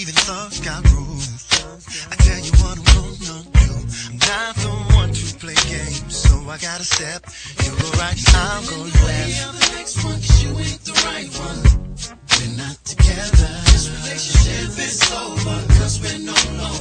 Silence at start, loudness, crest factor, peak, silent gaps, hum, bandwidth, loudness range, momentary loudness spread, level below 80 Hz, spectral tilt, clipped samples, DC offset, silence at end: 0 s; -17 LUFS; 16 dB; 0 dBFS; none; none; 9.4 kHz; 2 LU; 11 LU; -18 dBFS; -3.5 dB/octave; under 0.1%; under 0.1%; 0 s